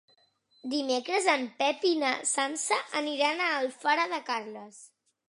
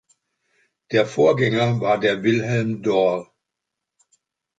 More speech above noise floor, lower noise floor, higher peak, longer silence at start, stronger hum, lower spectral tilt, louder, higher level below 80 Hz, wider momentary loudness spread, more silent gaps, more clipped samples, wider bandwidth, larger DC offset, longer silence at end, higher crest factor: second, 38 dB vs 64 dB; second, -67 dBFS vs -83 dBFS; second, -10 dBFS vs -4 dBFS; second, 0.65 s vs 0.9 s; neither; second, -0.5 dB/octave vs -6.5 dB/octave; second, -28 LUFS vs -20 LUFS; second, -88 dBFS vs -62 dBFS; first, 8 LU vs 5 LU; neither; neither; first, 11.5 kHz vs 9 kHz; neither; second, 0.4 s vs 1.35 s; about the same, 20 dB vs 18 dB